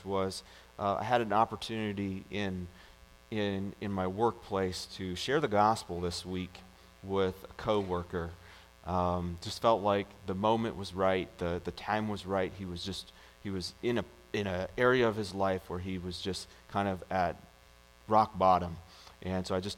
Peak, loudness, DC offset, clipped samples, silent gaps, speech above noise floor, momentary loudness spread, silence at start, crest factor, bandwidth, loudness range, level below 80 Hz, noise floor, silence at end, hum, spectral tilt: -12 dBFS; -33 LUFS; under 0.1%; under 0.1%; none; 27 dB; 13 LU; 0 s; 22 dB; 16.5 kHz; 3 LU; -58 dBFS; -59 dBFS; 0 s; none; -5.5 dB/octave